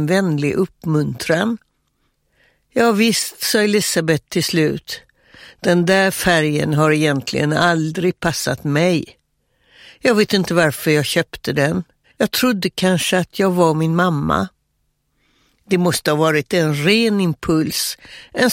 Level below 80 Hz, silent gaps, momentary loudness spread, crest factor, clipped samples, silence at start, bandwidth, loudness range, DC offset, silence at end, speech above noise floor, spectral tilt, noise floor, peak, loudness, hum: -48 dBFS; none; 7 LU; 18 dB; under 0.1%; 0 s; 16.5 kHz; 2 LU; under 0.1%; 0 s; 51 dB; -4.5 dB/octave; -68 dBFS; 0 dBFS; -17 LUFS; none